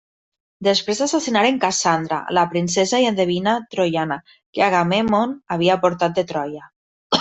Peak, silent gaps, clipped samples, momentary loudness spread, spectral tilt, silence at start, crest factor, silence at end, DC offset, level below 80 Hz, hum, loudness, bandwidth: 0 dBFS; 4.46-4.53 s, 6.76-7.10 s; under 0.1%; 7 LU; -4 dB/octave; 0.6 s; 18 dB; 0 s; under 0.1%; -60 dBFS; none; -19 LUFS; 8.4 kHz